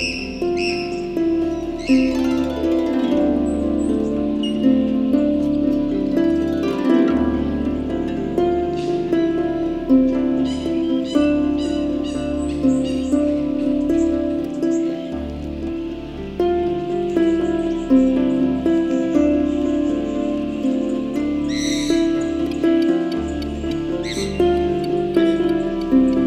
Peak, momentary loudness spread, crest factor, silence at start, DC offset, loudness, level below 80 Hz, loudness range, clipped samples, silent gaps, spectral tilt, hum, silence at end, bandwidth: -4 dBFS; 6 LU; 16 dB; 0 s; under 0.1%; -20 LUFS; -38 dBFS; 2 LU; under 0.1%; none; -6 dB/octave; none; 0 s; 10.5 kHz